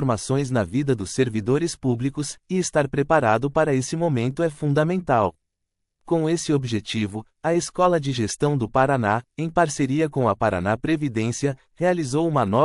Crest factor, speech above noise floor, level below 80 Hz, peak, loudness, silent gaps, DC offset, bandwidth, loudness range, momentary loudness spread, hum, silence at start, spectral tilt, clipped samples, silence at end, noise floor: 18 dB; 57 dB; -52 dBFS; -4 dBFS; -23 LUFS; none; under 0.1%; 11.5 kHz; 2 LU; 5 LU; none; 0 s; -6 dB/octave; under 0.1%; 0 s; -79 dBFS